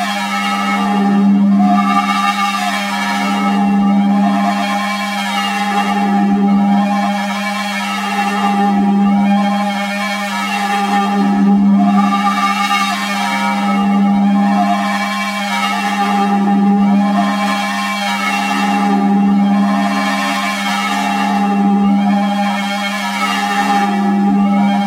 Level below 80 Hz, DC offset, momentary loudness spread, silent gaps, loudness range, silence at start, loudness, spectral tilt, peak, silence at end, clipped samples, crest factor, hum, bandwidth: -56 dBFS; under 0.1%; 5 LU; none; 2 LU; 0 s; -14 LUFS; -5.5 dB/octave; -2 dBFS; 0 s; under 0.1%; 12 dB; none; 15.5 kHz